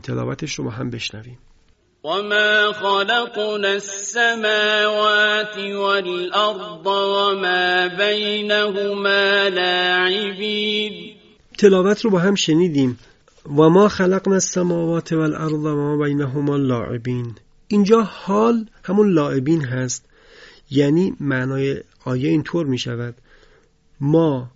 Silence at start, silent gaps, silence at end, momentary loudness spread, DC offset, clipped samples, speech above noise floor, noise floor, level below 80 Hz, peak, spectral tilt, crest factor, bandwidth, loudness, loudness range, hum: 0.05 s; none; 0.05 s; 11 LU; under 0.1%; under 0.1%; 38 dB; -57 dBFS; -54 dBFS; 0 dBFS; -4.5 dB/octave; 18 dB; 8 kHz; -18 LUFS; 4 LU; none